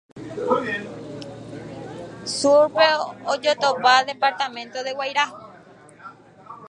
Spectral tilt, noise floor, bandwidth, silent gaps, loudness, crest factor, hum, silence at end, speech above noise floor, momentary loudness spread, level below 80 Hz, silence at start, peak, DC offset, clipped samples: -3 dB/octave; -47 dBFS; 11 kHz; none; -21 LUFS; 22 dB; none; 0 s; 27 dB; 19 LU; -64 dBFS; 0.15 s; -2 dBFS; under 0.1%; under 0.1%